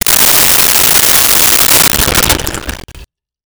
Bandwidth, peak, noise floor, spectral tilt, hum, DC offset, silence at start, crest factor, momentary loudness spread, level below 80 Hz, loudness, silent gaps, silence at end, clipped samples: over 20 kHz; 0 dBFS; -36 dBFS; -1 dB/octave; none; under 0.1%; 0.05 s; 10 dB; 11 LU; -26 dBFS; -5 LUFS; none; 0.4 s; under 0.1%